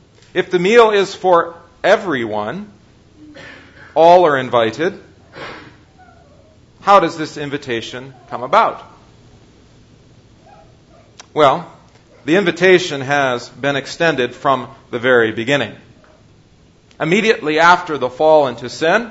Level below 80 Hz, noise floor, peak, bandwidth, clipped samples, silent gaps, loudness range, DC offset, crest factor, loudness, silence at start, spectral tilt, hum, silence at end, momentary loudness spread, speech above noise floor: -54 dBFS; -49 dBFS; 0 dBFS; 8 kHz; under 0.1%; none; 6 LU; under 0.1%; 16 dB; -15 LUFS; 0.35 s; -5 dB/octave; none; 0 s; 16 LU; 35 dB